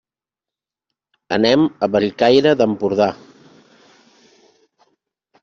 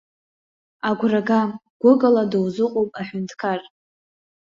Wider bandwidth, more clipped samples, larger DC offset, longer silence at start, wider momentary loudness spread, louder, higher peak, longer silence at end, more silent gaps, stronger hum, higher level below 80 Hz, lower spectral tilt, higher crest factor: about the same, 7.4 kHz vs 7.4 kHz; neither; neither; first, 1.3 s vs 0.85 s; second, 7 LU vs 12 LU; first, -16 LUFS vs -21 LUFS; about the same, -2 dBFS vs -4 dBFS; first, 2.25 s vs 0.8 s; second, none vs 1.70-1.80 s; neither; first, -58 dBFS vs -64 dBFS; second, -4 dB/octave vs -7.5 dB/octave; about the same, 18 dB vs 18 dB